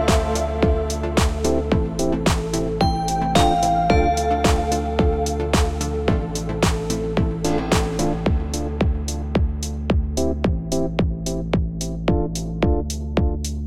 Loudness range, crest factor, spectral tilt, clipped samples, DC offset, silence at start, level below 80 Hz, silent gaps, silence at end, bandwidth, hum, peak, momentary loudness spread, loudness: 4 LU; 16 dB; -5.5 dB/octave; under 0.1%; 0.7%; 0 s; -26 dBFS; none; 0 s; 15.5 kHz; none; -4 dBFS; 6 LU; -21 LUFS